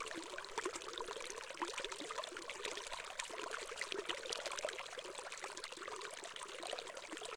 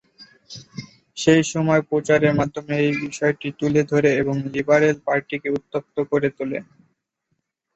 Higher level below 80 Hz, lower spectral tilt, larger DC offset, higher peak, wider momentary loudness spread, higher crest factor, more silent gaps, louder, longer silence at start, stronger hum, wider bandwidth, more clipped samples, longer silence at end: second, -72 dBFS vs -56 dBFS; second, -0.5 dB/octave vs -6 dB/octave; neither; second, -20 dBFS vs -2 dBFS; second, 5 LU vs 17 LU; first, 26 dB vs 20 dB; neither; second, -45 LUFS vs -21 LUFS; second, 0 s vs 0.2 s; neither; first, 18 kHz vs 8.2 kHz; neither; second, 0 s vs 1.15 s